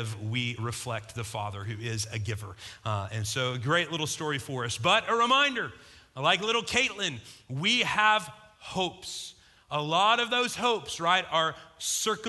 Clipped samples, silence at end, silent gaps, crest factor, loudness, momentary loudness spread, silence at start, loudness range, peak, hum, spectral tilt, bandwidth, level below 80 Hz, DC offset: under 0.1%; 0 s; none; 22 dB; -28 LUFS; 14 LU; 0 s; 6 LU; -8 dBFS; none; -3 dB/octave; 12.5 kHz; -58 dBFS; under 0.1%